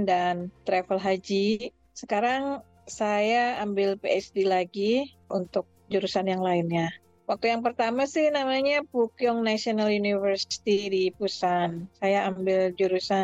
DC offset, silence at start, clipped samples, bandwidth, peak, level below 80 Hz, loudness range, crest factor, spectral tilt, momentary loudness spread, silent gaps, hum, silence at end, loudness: under 0.1%; 0 s; under 0.1%; 8.4 kHz; -12 dBFS; -66 dBFS; 2 LU; 14 dB; -5 dB/octave; 7 LU; none; none; 0 s; -26 LUFS